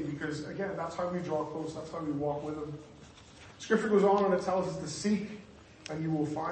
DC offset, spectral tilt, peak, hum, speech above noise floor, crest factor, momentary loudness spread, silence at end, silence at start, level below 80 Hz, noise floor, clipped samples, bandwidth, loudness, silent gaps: under 0.1%; -6 dB/octave; -14 dBFS; none; 21 dB; 18 dB; 22 LU; 0 s; 0 s; -64 dBFS; -53 dBFS; under 0.1%; 8.8 kHz; -32 LUFS; none